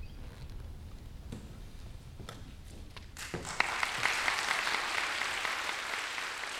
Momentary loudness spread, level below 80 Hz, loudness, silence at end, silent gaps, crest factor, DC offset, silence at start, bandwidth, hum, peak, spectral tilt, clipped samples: 19 LU; -50 dBFS; -33 LUFS; 0 s; none; 26 dB; under 0.1%; 0 s; 18 kHz; none; -12 dBFS; -1.5 dB/octave; under 0.1%